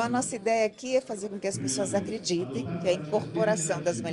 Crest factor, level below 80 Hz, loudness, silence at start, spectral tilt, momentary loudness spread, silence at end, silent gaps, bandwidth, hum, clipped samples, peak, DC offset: 16 dB; -66 dBFS; -29 LUFS; 0 s; -4.5 dB/octave; 5 LU; 0 s; none; 12 kHz; none; under 0.1%; -12 dBFS; under 0.1%